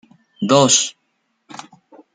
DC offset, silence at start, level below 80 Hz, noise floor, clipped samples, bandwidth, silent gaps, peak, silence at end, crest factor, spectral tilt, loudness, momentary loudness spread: under 0.1%; 0.4 s; -64 dBFS; -69 dBFS; under 0.1%; 10 kHz; none; -2 dBFS; 1.25 s; 18 dB; -3 dB/octave; -15 LUFS; 26 LU